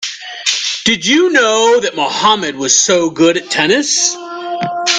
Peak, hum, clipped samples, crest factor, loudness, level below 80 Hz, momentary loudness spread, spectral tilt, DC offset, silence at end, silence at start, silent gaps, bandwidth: 0 dBFS; none; under 0.1%; 14 dB; -12 LUFS; -56 dBFS; 9 LU; -1.5 dB/octave; under 0.1%; 0 s; 0 s; none; 10.5 kHz